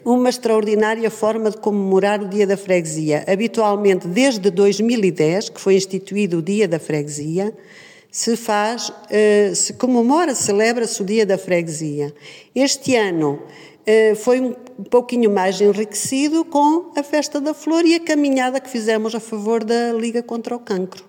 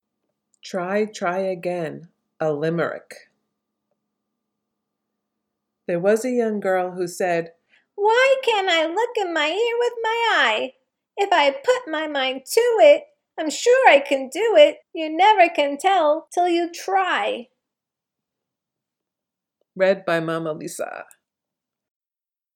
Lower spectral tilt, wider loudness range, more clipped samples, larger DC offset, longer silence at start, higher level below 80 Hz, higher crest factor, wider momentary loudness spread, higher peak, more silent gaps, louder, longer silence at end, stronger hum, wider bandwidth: about the same, -4.5 dB/octave vs -3.5 dB/octave; second, 3 LU vs 11 LU; neither; neither; second, 0.05 s vs 0.65 s; first, -70 dBFS vs -82 dBFS; second, 16 dB vs 22 dB; second, 8 LU vs 15 LU; about the same, -2 dBFS vs 0 dBFS; neither; about the same, -18 LUFS vs -20 LUFS; second, 0.05 s vs 1.5 s; neither; about the same, 17 kHz vs 16.5 kHz